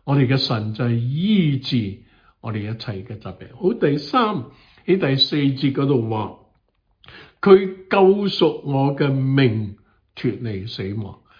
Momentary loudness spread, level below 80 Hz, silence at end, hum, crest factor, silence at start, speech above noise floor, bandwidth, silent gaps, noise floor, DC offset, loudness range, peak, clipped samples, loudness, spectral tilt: 16 LU; -56 dBFS; 0.25 s; none; 20 dB; 0.05 s; 45 dB; 5.2 kHz; none; -65 dBFS; under 0.1%; 5 LU; 0 dBFS; under 0.1%; -20 LUFS; -8.5 dB/octave